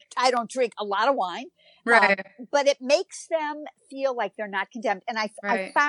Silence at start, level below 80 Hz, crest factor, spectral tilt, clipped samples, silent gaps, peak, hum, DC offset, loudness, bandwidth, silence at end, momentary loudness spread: 0.15 s; -88 dBFS; 22 dB; -2.5 dB/octave; under 0.1%; none; -4 dBFS; none; under 0.1%; -25 LUFS; 11 kHz; 0 s; 12 LU